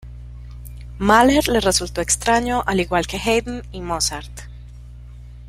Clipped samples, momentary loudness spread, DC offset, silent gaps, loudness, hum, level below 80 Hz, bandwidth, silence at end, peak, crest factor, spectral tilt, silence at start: under 0.1%; 23 LU; under 0.1%; none; -18 LUFS; 60 Hz at -35 dBFS; -34 dBFS; 16 kHz; 0 s; -2 dBFS; 20 dB; -3.5 dB/octave; 0.05 s